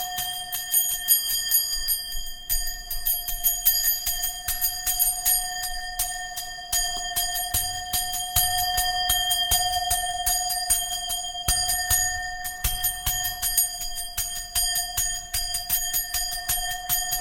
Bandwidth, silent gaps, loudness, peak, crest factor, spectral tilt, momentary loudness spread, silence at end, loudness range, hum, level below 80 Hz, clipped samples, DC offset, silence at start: 17.5 kHz; none; -23 LUFS; -4 dBFS; 22 dB; 1 dB/octave; 8 LU; 0 s; 2 LU; none; -38 dBFS; under 0.1%; under 0.1%; 0 s